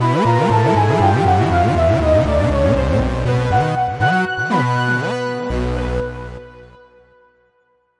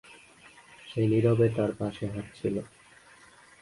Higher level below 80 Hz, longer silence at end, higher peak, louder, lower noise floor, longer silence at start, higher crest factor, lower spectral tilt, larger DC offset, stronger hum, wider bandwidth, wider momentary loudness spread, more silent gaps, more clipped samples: first, -30 dBFS vs -58 dBFS; first, 1.35 s vs 0.95 s; first, -2 dBFS vs -12 dBFS; first, -16 LUFS vs -28 LUFS; first, -61 dBFS vs -55 dBFS; about the same, 0 s vs 0.1 s; about the same, 14 dB vs 18 dB; about the same, -7 dB/octave vs -8 dB/octave; neither; neither; about the same, 11 kHz vs 11.5 kHz; second, 8 LU vs 14 LU; neither; neither